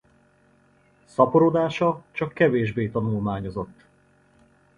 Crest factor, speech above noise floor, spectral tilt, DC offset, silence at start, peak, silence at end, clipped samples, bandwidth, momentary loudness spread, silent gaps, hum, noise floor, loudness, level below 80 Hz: 22 dB; 37 dB; -8 dB/octave; under 0.1%; 1.2 s; -4 dBFS; 1.05 s; under 0.1%; 10 kHz; 14 LU; none; none; -60 dBFS; -23 LUFS; -54 dBFS